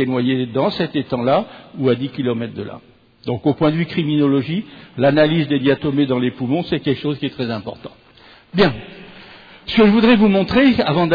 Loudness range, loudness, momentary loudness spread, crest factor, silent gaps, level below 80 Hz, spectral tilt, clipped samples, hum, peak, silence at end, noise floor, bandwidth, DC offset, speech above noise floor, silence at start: 4 LU; -17 LUFS; 18 LU; 14 dB; none; -48 dBFS; -9 dB/octave; under 0.1%; none; -4 dBFS; 0 s; -47 dBFS; 5 kHz; under 0.1%; 30 dB; 0 s